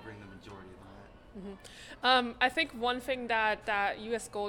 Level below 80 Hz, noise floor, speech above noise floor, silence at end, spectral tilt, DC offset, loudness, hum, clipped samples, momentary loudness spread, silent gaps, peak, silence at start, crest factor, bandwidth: -60 dBFS; -53 dBFS; 21 dB; 0 s; -3 dB/octave; under 0.1%; -30 LUFS; none; under 0.1%; 23 LU; none; -12 dBFS; 0 s; 22 dB; 19 kHz